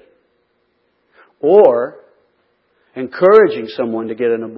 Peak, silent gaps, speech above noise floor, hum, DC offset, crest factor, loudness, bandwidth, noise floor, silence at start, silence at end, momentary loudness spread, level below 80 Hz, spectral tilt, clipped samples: 0 dBFS; none; 51 dB; none; under 0.1%; 16 dB; -13 LUFS; 5.8 kHz; -63 dBFS; 1.45 s; 0 s; 17 LU; -64 dBFS; -8.5 dB/octave; under 0.1%